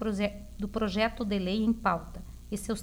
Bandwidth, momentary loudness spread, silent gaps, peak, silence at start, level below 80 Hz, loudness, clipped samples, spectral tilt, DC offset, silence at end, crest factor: 16.5 kHz; 11 LU; none; -14 dBFS; 0 s; -46 dBFS; -31 LUFS; under 0.1%; -5.5 dB/octave; under 0.1%; 0 s; 18 dB